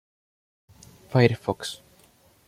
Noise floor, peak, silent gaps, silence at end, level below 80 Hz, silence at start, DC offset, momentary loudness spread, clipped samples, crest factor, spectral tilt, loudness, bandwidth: -59 dBFS; -4 dBFS; none; 0.7 s; -60 dBFS; 1.1 s; under 0.1%; 15 LU; under 0.1%; 24 dB; -6.5 dB/octave; -24 LUFS; 15.5 kHz